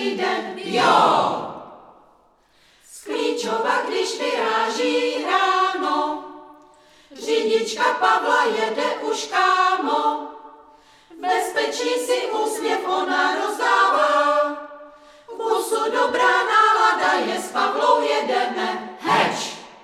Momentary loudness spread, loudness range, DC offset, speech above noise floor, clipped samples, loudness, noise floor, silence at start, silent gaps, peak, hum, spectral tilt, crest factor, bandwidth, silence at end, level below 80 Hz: 11 LU; 5 LU; under 0.1%; 38 dB; under 0.1%; -20 LUFS; -58 dBFS; 0 s; none; -4 dBFS; none; -2.5 dB/octave; 18 dB; 15.5 kHz; 0.1 s; -68 dBFS